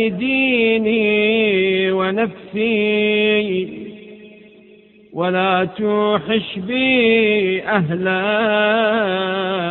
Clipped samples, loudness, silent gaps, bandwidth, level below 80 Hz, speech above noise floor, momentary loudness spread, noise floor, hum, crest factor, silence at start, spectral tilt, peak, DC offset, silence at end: under 0.1%; -17 LUFS; none; 4.2 kHz; -58 dBFS; 30 dB; 7 LU; -47 dBFS; none; 16 dB; 0 s; -3 dB/octave; -2 dBFS; under 0.1%; 0 s